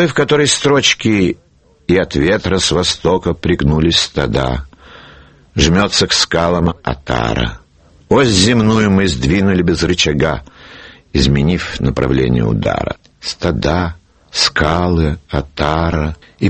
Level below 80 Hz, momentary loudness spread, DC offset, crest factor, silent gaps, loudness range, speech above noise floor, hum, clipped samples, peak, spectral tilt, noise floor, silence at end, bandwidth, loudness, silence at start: -28 dBFS; 10 LU; under 0.1%; 14 dB; none; 3 LU; 28 dB; none; under 0.1%; 0 dBFS; -4.5 dB/octave; -42 dBFS; 0 s; 8.8 kHz; -14 LUFS; 0 s